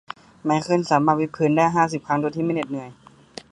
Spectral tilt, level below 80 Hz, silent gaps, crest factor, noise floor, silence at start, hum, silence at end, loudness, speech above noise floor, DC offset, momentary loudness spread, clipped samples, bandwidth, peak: -6.5 dB/octave; -60 dBFS; none; 20 dB; -43 dBFS; 0.45 s; none; 0.6 s; -21 LUFS; 22 dB; under 0.1%; 21 LU; under 0.1%; 11 kHz; -4 dBFS